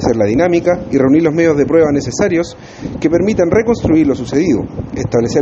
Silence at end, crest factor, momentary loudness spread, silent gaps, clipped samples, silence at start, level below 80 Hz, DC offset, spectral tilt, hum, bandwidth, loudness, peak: 0 s; 12 dB; 8 LU; none; under 0.1%; 0 s; -36 dBFS; under 0.1%; -6.5 dB/octave; none; 8 kHz; -13 LUFS; 0 dBFS